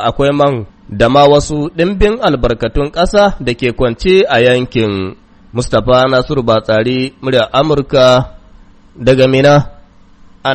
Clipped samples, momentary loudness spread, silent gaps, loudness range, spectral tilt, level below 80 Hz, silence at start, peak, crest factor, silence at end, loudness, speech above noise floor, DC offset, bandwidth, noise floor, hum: 0.2%; 9 LU; none; 1 LU; -6 dB/octave; -28 dBFS; 0 s; 0 dBFS; 12 dB; 0 s; -11 LUFS; 30 dB; under 0.1%; 8.8 kHz; -40 dBFS; none